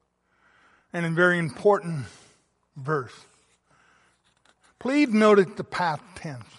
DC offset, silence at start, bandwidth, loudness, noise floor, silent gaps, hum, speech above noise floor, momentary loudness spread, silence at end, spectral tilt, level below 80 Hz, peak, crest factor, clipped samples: under 0.1%; 0.95 s; 11.5 kHz; -24 LUFS; -66 dBFS; none; none; 43 dB; 19 LU; 0.15 s; -6.5 dB/octave; -66 dBFS; -6 dBFS; 20 dB; under 0.1%